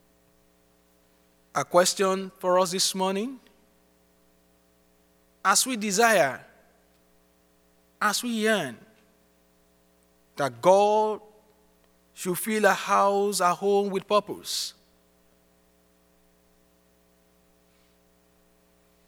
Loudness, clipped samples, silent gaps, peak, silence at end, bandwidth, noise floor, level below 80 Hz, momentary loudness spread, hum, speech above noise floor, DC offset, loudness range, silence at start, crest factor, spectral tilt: -24 LUFS; under 0.1%; none; -6 dBFS; 4.4 s; over 20 kHz; -63 dBFS; -72 dBFS; 12 LU; none; 39 dB; under 0.1%; 6 LU; 1.55 s; 22 dB; -3 dB/octave